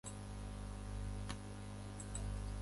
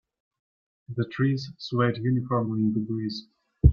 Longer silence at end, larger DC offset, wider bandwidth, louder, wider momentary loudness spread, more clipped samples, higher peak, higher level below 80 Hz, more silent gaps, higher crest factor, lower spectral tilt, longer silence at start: about the same, 0 s vs 0 s; neither; first, 11.5 kHz vs 6.8 kHz; second, -48 LUFS vs -27 LUFS; second, 4 LU vs 8 LU; neither; second, -30 dBFS vs -4 dBFS; second, -48 dBFS vs -34 dBFS; neither; second, 16 dB vs 22 dB; second, -5 dB/octave vs -8.5 dB/octave; second, 0.05 s vs 0.9 s